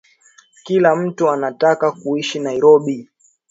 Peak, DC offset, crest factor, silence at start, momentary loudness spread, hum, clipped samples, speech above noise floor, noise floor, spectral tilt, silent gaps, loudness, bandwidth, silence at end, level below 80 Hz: 0 dBFS; under 0.1%; 16 dB; 0.65 s; 9 LU; none; under 0.1%; 36 dB; -51 dBFS; -5.5 dB/octave; none; -16 LUFS; 8 kHz; 0.45 s; -66 dBFS